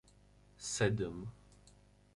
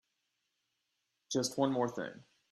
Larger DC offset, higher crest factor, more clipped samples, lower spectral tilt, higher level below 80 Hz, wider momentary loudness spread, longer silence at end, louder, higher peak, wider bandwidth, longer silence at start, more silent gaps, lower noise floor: neither; about the same, 22 dB vs 22 dB; neither; about the same, -4.5 dB/octave vs -4.5 dB/octave; first, -62 dBFS vs -80 dBFS; first, 15 LU vs 11 LU; first, 0.45 s vs 0.3 s; about the same, -37 LUFS vs -35 LUFS; about the same, -18 dBFS vs -18 dBFS; second, 11.5 kHz vs 13 kHz; second, 0.6 s vs 1.3 s; neither; second, -64 dBFS vs -84 dBFS